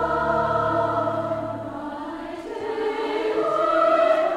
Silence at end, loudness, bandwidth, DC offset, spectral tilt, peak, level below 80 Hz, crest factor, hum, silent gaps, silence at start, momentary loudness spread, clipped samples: 0 s; -23 LUFS; 10.5 kHz; under 0.1%; -6.5 dB/octave; -8 dBFS; -50 dBFS; 14 dB; none; none; 0 s; 14 LU; under 0.1%